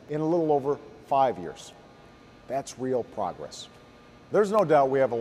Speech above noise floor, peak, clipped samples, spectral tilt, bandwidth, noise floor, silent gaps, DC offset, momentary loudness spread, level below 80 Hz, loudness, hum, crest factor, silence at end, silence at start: 26 dB; -10 dBFS; under 0.1%; -6 dB/octave; 13.5 kHz; -52 dBFS; none; under 0.1%; 19 LU; -64 dBFS; -26 LUFS; none; 18 dB; 0 s; 0.1 s